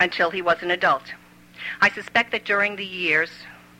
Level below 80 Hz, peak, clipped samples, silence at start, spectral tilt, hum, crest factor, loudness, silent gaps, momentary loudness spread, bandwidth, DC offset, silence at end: -62 dBFS; -6 dBFS; under 0.1%; 0 s; -4 dB/octave; none; 18 dB; -21 LUFS; none; 14 LU; 16.5 kHz; under 0.1%; 0.25 s